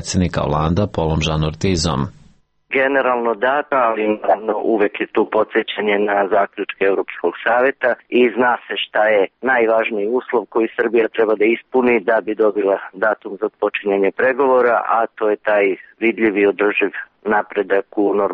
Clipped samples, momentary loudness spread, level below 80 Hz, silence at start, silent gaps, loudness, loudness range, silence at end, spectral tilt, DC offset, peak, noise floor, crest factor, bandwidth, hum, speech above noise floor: under 0.1%; 5 LU; -42 dBFS; 0 s; none; -17 LUFS; 2 LU; 0 s; -5.5 dB/octave; under 0.1%; -4 dBFS; -51 dBFS; 12 dB; 8.4 kHz; none; 34 dB